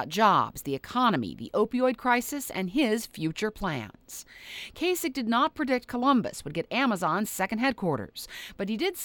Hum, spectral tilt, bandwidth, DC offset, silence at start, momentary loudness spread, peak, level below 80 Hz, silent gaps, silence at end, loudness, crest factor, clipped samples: none; -4.5 dB/octave; over 20 kHz; under 0.1%; 0 s; 14 LU; -8 dBFS; -56 dBFS; none; 0 s; -28 LUFS; 20 dB; under 0.1%